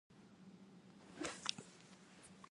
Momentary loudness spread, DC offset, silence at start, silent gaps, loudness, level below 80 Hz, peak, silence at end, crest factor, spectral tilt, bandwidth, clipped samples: 19 LU; under 0.1%; 0.1 s; none; -47 LUFS; -82 dBFS; -16 dBFS; 0 s; 38 dB; -2 dB/octave; 11.5 kHz; under 0.1%